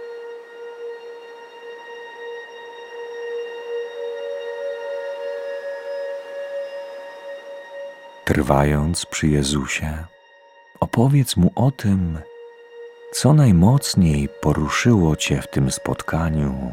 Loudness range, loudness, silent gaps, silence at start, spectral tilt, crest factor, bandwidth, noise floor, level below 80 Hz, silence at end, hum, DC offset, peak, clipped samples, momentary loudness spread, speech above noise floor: 14 LU; -21 LUFS; none; 0 s; -6 dB/octave; 22 dB; 16.5 kHz; -50 dBFS; -36 dBFS; 0 s; none; under 0.1%; 0 dBFS; under 0.1%; 20 LU; 32 dB